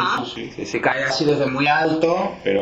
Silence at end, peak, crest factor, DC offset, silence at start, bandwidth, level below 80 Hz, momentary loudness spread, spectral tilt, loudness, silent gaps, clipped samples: 0 s; -2 dBFS; 18 dB; under 0.1%; 0 s; 8.2 kHz; -54 dBFS; 9 LU; -5 dB/octave; -20 LUFS; none; under 0.1%